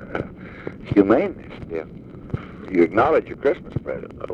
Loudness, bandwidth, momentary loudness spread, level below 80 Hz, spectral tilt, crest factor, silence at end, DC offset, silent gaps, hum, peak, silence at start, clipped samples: -22 LUFS; 6.8 kHz; 19 LU; -46 dBFS; -9 dB/octave; 20 dB; 0 s; under 0.1%; none; none; -2 dBFS; 0 s; under 0.1%